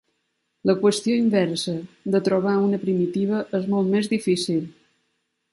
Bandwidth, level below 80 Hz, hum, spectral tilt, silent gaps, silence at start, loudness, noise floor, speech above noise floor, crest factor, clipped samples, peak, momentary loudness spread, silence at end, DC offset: 11.5 kHz; -66 dBFS; none; -6 dB/octave; none; 0.65 s; -22 LUFS; -74 dBFS; 52 dB; 16 dB; under 0.1%; -6 dBFS; 7 LU; 0.8 s; under 0.1%